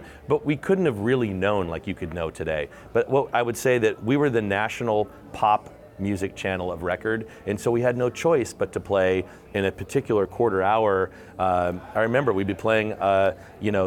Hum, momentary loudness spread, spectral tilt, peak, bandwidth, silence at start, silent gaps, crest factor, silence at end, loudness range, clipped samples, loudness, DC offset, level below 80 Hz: none; 8 LU; -6 dB/octave; -8 dBFS; 16.5 kHz; 0 s; none; 14 dB; 0 s; 3 LU; under 0.1%; -24 LUFS; under 0.1%; -52 dBFS